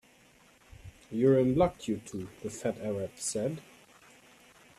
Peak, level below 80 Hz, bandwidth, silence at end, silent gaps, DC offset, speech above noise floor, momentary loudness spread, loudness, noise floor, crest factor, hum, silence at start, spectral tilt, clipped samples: -12 dBFS; -58 dBFS; 14 kHz; 1.2 s; none; under 0.1%; 31 dB; 17 LU; -31 LUFS; -61 dBFS; 20 dB; none; 0.85 s; -6 dB/octave; under 0.1%